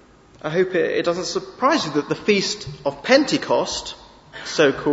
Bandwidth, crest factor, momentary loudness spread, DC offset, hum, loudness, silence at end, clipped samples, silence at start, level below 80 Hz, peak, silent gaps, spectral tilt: 8 kHz; 20 dB; 14 LU; under 0.1%; none; -21 LUFS; 0 s; under 0.1%; 0.45 s; -54 dBFS; -2 dBFS; none; -4 dB/octave